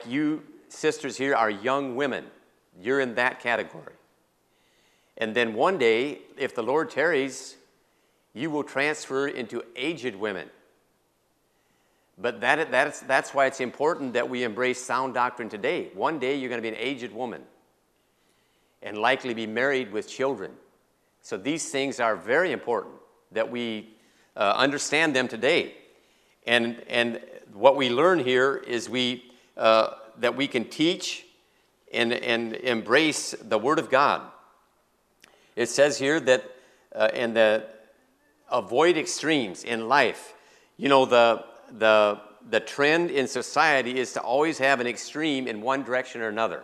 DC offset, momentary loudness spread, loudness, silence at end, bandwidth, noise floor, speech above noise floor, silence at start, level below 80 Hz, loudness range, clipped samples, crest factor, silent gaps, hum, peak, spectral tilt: under 0.1%; 12 LU; -25 LUFS; 0 s; 13.5 kHz; -69 dBFS; 44 dB; 0 s; -76 dBFS; 7 LU; under 0.1%; 24 dB; none; none; -2 dBFS; -3.5 dB/octave